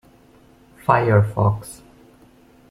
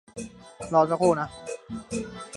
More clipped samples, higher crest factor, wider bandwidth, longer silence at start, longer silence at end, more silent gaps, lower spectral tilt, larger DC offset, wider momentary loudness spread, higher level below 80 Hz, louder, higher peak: neither; about the same, 20 dB vs 20 dB; first, 13.5 kHz vs 11.5 kHz; first, 0.9 s vs 0.15 s; first, 0.95 s vs 0 s; neither; first, -8 dB/octave vs -5.5 dB/octave; neither; second, 14 LU vs 19 LU; first, -50 dBFS vs -56 dBFS; first, -19 LUFS vs -26 LUFS; first, -2 dBFS vs -8 dBFS